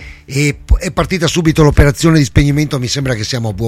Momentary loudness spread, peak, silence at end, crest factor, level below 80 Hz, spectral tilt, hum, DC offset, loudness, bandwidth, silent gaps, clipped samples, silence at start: 7 LU; 0 dBFS; 0 s; 12 dB; -20 dBFS; -5.5 dB/octave; none; under 0.1%; -13 LUFS; 15.5 kHz; none; under 0.1%; 0 s